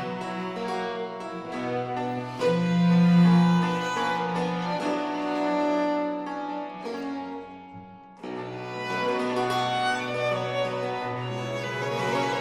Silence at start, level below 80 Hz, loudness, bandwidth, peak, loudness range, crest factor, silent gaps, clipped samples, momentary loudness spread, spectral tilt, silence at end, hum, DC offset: 0 s; -66 dBFS; -27 LUFS; 10.5 kHz; -10 dBFS; 8 LU; 16 dB; none; under 0.1%; 14 LU; -6.5 dB/octave; 0 s; none; under 0.1%